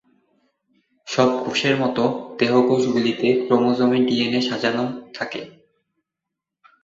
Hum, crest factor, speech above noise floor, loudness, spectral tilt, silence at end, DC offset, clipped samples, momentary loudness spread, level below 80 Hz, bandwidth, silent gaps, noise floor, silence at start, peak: none; 18 dB; 64 dB; -20 LUFS; -5.5 dB/octave; 1.35 s; under 0.1%; under 0.1%; 11 LU; -64 dBFS; 7.8 kHz; none; -84 dBFS; 1.05 s; -2 dBFS